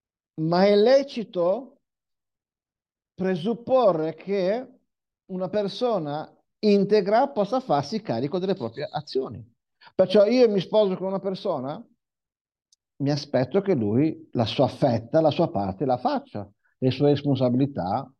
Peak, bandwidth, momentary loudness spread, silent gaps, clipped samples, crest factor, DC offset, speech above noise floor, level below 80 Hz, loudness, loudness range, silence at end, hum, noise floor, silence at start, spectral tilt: -8 dBFS; 8.8 kHz; 11 LU; 12.41-12.45 s; under 0.1%; 18 dB; under 0.1%; over 67 dB; -68 dBFS; -24 LUFS; 3 LU; 0.15 s; none; under -90 dBFS; 0.35 s; -7.5 dB/octave